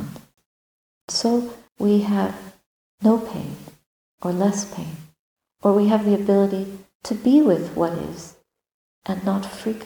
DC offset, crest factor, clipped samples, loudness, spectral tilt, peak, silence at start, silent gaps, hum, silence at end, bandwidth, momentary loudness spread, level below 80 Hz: under 0.1%; 18 dB; under 0.1%; -21 LUFS; -6 dB/octave; -4 dBFS; 0 s; 0.46-1.08 s, 2.66-2.98 s, 3.86-4.18 s, 5.19-5.36 s, 6.95-7.00 s, 8.74-9.02 s; none; 0 s; 20 kHz; 18 LU; -58 dBFS